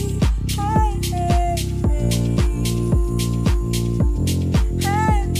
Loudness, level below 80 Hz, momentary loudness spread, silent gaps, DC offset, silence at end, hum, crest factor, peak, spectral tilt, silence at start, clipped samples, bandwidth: -20 LUFS; -22 dBFS; 2 LU; none; under 0.1%; 0 s; none; 12 dB; -6 dBFS; -6 dB/octave; 0 s; under 0.1%; 16 kHz